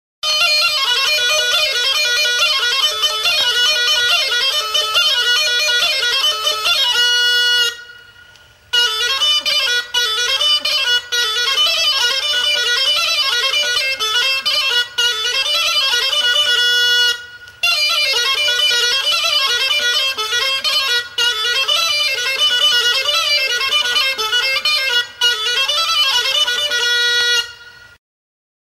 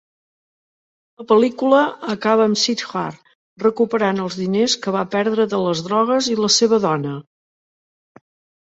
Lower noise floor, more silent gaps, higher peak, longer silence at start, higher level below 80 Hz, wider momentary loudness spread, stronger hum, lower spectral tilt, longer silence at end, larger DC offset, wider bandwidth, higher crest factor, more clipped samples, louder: second, -46 dBFS vs under -90 dBFS; second, none vs 3.35-3.56 s; about the same, -4 dBFS vs -2 dBFS; second, 0.25 s vs 1.2 s; first, -56 dBFS vs -64 dBFS; second, 3 LU vs 8 LU; neither; second, 3 dB/octave vs -4 dB/octave; second, 0.9 s vs 1.45 s; neither; first, 16 kHz vs 8 kHz; second, 12 dB vs 18 dB; neither; first, -13 LUFS vs -18 LUFS